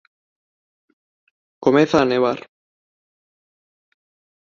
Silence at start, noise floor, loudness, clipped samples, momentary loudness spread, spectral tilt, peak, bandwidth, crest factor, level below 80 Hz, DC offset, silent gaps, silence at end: 1.6 s; under -90 dBFS; -18 LUFS; under 0.1%; 7 LU; -6 dB/octave; -2 dBFS; 7.4 kHz; 22 dB; -58 dBFS; under 0.1%; none; 2 s